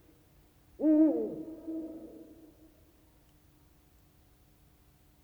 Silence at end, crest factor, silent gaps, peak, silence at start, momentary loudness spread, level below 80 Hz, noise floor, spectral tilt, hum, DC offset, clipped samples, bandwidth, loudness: 3 s; 20 dB; none; -16 dBFS; 0.8 s; 26 LU; -68 dBFS; -63 dBFS; -8.5 dB/octave; none; under 0.1%; under 0.1%; 20 kHz; -30 LUFS